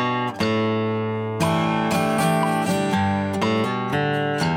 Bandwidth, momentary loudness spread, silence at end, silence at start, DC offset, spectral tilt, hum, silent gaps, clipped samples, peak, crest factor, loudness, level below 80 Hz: 19.5 kHz; 3 LU; 0 s; 0 s; under 0.1%; -6 dB/octave; none; none; under 0.1%; -8 dBFS; 14 dB; -22 LUFS; -60 dBFS